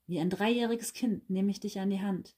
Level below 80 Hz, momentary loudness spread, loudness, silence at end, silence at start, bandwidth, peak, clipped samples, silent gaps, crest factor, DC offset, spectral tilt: -70 dBFS; 5 LU; -32 LUFS; 0.1 s; 0.1 s; 16 kHz; -18 dBFS; under 0.1%; none; 14 dB; under 0.1%; -5.5 dB/octave